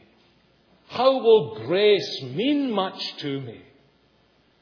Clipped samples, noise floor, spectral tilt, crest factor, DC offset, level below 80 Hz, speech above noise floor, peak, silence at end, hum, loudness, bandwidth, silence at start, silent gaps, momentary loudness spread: under 0.1%; -62 dBFS; -6 dB/octave; 18 dB; under 0.1%; -74 dBFS; 40 dB; -6 dBFS; 1.05 s; none; -22 LUFS; 5.4 kHz; 0.9 s; none; 13 LU